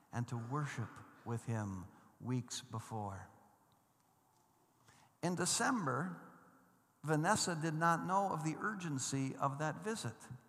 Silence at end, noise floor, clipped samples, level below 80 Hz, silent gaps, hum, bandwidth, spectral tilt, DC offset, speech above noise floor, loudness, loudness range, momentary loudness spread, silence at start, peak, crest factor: 0.1 s; -74 dBFS; under 0.1%; -84 dBFS; none; none; 14.5 kHz; -4.5 dB/octave; under 0.1%; 35 dB; -39 LUFS; 10 LU; 14 LU; 0.15 s; -18 dBFS; 22 dB